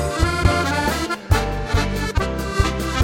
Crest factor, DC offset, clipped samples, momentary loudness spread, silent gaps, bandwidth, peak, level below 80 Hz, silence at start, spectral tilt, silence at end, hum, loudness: 16 dB; under 0.1%; under 0.1%; 4 LU; none; 17 kHz; -2 dBFS; -26 dBFS; 0 s; -5 dB/octave; 0 s; none; -21 LUFS